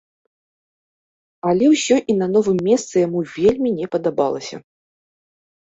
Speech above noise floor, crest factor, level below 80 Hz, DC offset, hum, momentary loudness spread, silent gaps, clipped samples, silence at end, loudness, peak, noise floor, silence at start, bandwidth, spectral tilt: over 73 dB; 16 dB; -56 dBFS; under 0.1%; none; 9 LU; none; under 0.1%; 1.2 s; -18 LUFS; -4 dBFS; under -90 dBFS; 1.45 s; 8.2 kHz; -5.5 dB/octave